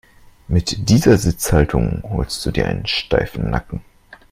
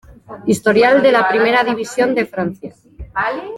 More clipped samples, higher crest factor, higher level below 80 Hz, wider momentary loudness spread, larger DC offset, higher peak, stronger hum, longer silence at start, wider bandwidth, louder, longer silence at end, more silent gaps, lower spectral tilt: neither; about the same, 18 dB vs 16 dB; first, -30 dBFS vs -46 dBFS; second, 9 LU vs 14 LU; neither; about the same, 0 dBFS vs 0 dBFS; neither; first, 0.5 s vs 0.1 s; first, 16.5 kHz vs 13.5 kHz; second, -18 LUFS vs -15 LUFS; first, 0.15 s vs 0 s; neither; about the same, -5.5 dB/octave vs -5 dB/octave